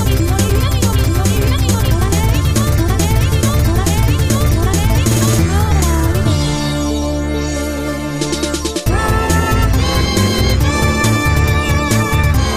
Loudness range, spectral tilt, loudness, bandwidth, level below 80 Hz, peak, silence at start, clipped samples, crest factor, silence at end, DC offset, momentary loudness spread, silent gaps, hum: 3 LU; -5 dB/octave; -14 LUFS; 15.5 kHz; -18 dBFS; -2 dBFS; 0 s; under 0.1%; 12 dB; 0 s; under 0.1%; 5 LU; none; none